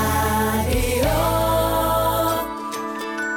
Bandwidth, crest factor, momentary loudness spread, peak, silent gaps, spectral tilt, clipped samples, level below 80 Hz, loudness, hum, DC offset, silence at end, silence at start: 18 kHz; 10 dB; 8 LU; -10 dBFS; none; -4.5 dB/octave; under 0.1%; -30 dBFS; -21 LUFS; none; under 0.1%; 0 s; 0 s